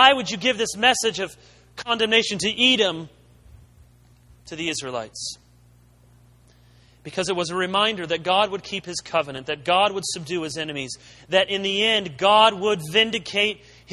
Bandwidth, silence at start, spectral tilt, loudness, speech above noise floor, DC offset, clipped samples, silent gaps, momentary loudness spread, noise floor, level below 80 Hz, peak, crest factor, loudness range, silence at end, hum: 13 kHz; 0 s; -2.5 dB/octave; -21 LUFS; 31 dB; under 0.1%; under 0.1%; none; 15 LU; -54 dBFS; -58 dBFS; 0 dBFS; 24 dB; 13 LU; 0 s; 60 Hz at -55 dBFS